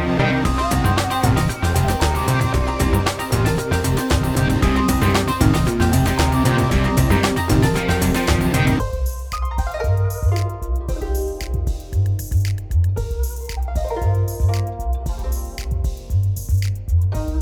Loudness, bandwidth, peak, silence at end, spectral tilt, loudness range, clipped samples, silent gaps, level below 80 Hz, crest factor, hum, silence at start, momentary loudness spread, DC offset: -20 LUFS; 20 kHz; -2 dBFS; 0 s; -5.5 dB/octave; 6 LU; under 0.1%; none; -24 dBFS; 16 dB; none; 0 s; 8 LU; under 0.1%